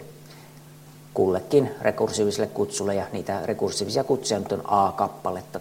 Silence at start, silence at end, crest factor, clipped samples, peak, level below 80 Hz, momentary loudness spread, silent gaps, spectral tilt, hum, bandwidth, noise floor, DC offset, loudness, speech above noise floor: 0 s; 0 s; 18 dB; under 0.1%; -6 dBFS; -62 dBFS; 9 LU; none; -4.5 dB/octave; none; 16.5 kHz; -46 dBFS; under 0.1%; -25 LUFS; 22 dB